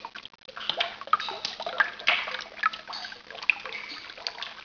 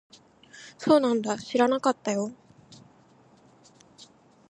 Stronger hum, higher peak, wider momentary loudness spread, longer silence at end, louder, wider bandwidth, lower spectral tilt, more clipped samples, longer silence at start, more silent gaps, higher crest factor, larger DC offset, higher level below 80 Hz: neither; first, -4 dBFS vs -8 dBFS; about the same, 13 LU vs 15 LU; second, 0 s vs 2.15 s; second, -29 LUFS vs -25 LUFS; second, 5.4 kHz vs 11 kHz; second, -0.5 dB/octave vs -4.5 dB/octave; neither; second, 0 s vs 0.55 s; neither; about the same, 26 dB vs 22 dB; neither; about the same, -70 dBFS vs -74 dBFS